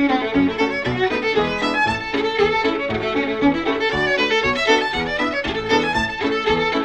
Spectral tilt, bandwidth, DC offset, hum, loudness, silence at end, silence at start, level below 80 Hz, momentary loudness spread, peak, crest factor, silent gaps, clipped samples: -4.5 dB/octave; 9.8 kHz; 0.3%; none; -19 LUFS; 0 s; 0 s; -42 dBFS; 4 LU; -4 dBFS; 16 dB; none; under 0.1%